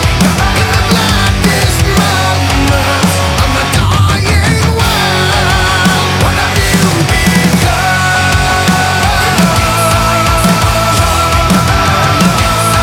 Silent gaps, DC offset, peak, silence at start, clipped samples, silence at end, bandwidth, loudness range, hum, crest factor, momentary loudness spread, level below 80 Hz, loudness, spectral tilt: none; under 0.1%; 0 dBFS; 0 s; under 0.1%; 0 s; 18.5 kHz; 1 LU; none; 10 dB; 1 LU; -20 dBFS; -9 LUFS; -4 dB/octave